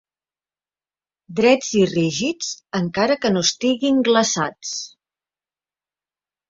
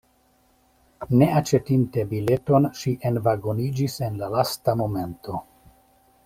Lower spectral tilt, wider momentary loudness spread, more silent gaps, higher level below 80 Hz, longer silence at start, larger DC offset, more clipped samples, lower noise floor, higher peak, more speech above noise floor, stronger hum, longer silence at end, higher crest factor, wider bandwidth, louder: second, -4 dB/octave vs -7 dB/octave; about the same, 12 LU vs 11 LU; neither; second, -60 dBFS vs -54 dBFS; first, 1.3 s vs 1 s; neither; neither; first, under -90 dBFS vs -62 dBFS; about the same, -2 dBFS vs -4 dBFS; first, over 71 dB vs 40 dB; neither; first, 1.65 s vs 0.85 s; about the same, 20 dB vs 20 dB; second, 7.8 kHz vs 16 kHz; first, -19 LUFS vs -23 LUFS